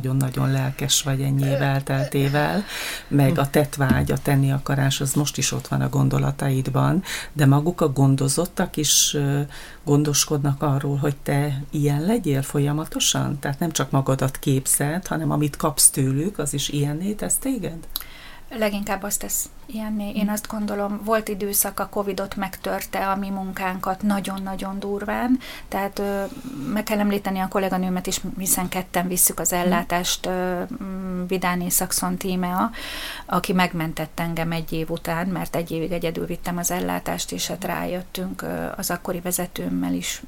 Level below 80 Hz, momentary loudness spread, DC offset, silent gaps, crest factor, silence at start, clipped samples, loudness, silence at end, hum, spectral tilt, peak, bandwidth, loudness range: -42 dBFS; 9 LU; under 0.1%; none; 22 dB; 0 s; under 0.1%; -23 LUFS; 0 s; none; -4.5 dB/octave; 0 dBFS; 17 kHz; 6 LU